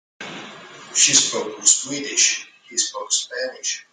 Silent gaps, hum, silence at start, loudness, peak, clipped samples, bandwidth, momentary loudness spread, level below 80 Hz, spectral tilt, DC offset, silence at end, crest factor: none; none; 0.2 s; -18 LUFS; 0 dBFS; under 0.1%; 11 kHz; 20 LU; -72 dBFS; 0.5 dB/octave; under 0.1%; 0.1 s; 22 dB